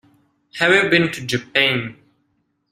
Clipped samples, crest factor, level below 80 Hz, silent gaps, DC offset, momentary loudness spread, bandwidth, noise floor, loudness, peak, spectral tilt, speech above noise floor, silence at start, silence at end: under 0.1%; 20 dB; -58 dBFS; none; under 0.1%; 14 LU; 15 kHz; -68 dBFS; -17 LUFS; -2 dBFS; -4.5 dB/octave; 50 dB; 0.55 s; 0.8 s